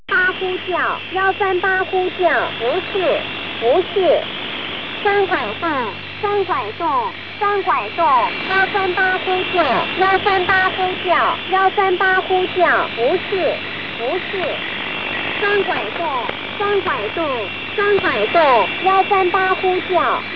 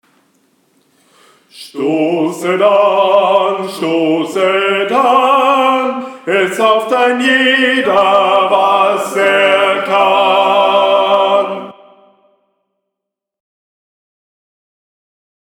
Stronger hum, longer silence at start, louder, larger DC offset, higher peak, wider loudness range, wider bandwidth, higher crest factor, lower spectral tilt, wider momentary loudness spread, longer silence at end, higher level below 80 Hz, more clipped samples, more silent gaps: neither; second, 0.1 s vs 1.55 s; second, -17 LUFS vs -11 LUFS; first, 0.8% vs under 0.1%; second, -4 dBFS vs 0 dBFS; about the same, 4 LU vs 5 LU; second, 5.4 kHz vs 17.5 kHz; about the same, 14 dB vs 14 dB; first, -6 dB/octave vs -4 dB/octave; about the same, 7 LU vs 7 LU; second, 0 s vs 3.7 s; first, -54 dBFS vs -64 dBFS; neither; neither